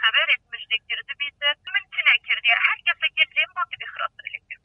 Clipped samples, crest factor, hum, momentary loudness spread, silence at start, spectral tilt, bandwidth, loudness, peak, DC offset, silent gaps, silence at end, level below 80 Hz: under 0.1%; 20 dB; none; 12 LU; 0 s; -0.5 dB/octave; 6 kHz; -21 LUFS; -4 dBFS; under 0.1%; none; 0.1 s; -70 dBFS